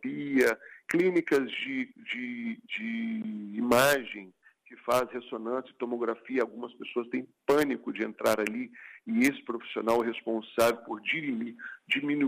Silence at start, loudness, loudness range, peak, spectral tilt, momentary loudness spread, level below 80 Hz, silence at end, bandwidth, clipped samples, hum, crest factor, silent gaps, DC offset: 0.05 s; -30 LUFS; 2 LU; -12 dBFS; -4.5 dB/octave; 11 LU; -68 dBFS; 0 s; 15.5 kHz; under 0.1%; none; 18 dB; none; under 0.1%